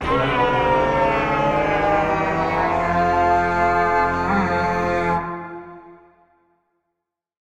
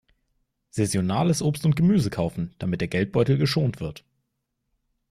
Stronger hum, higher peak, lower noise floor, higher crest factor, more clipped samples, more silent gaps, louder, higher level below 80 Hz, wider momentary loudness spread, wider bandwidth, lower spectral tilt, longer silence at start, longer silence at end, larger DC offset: neither; about the same, -6 dBFS vs -8 dBFS; about the same, -80 dBFS vs -78 dBFS; about the same, 14 dB vs 16 dB; neither; neither; first, -19 LUFS vs -24 LUFS; first, -40 dBFS vs -52 dBFS; second, 4 LU vs 9 LU; second, 11.5 kHz vs 14.5 kHz; about the same, -6.5 dB/octave vs -6.5 dB/octave; second, 0 s vs 0.75 s; first, 1.55 s vs 1.2 s; neither